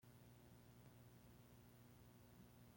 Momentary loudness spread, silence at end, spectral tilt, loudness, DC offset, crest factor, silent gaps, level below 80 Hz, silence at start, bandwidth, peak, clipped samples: 1 LU; 0 s; -5.5 dB/octave; -67 LUFS; under 0.1%; 14 dB; none; -78 dBFS; 0 s; 16.5 kHz; -52 dBFS; under 0.1%